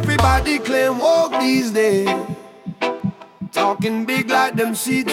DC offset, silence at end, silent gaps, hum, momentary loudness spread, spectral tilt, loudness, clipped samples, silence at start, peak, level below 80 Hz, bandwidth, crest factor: under 0.1%; 0 s; none; none; 11 LU; -5 dB/octave; -18 LUFS; under 0.1%; 0 s; -4 dBFS; -34 dBFS; 17.5 kHz; 16 dB